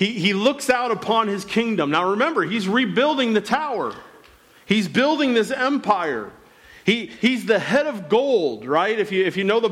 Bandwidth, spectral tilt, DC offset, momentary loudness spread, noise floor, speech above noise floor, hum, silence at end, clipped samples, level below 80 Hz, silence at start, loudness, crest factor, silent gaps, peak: 15 kHz; -5 dB/octave; under 0.1%; 4 LU; -51 dBFS; 30 dB; none; 0 s; under 0.1%; -62 dBFS; 0 s; -20 LUFS; 14 dB; none; -6 dBFS